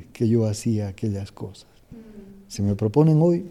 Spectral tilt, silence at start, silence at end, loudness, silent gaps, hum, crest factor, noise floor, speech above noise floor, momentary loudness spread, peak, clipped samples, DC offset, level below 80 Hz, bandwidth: -8 dB/octave; 0 s; 0 s; -22 LUFS; none; none; 18 dB; -44 dBFS; 22 dB; 20 LU; -6 dBFS; under 0.1%; under 0.1%; -54 dBFS; 13 kHz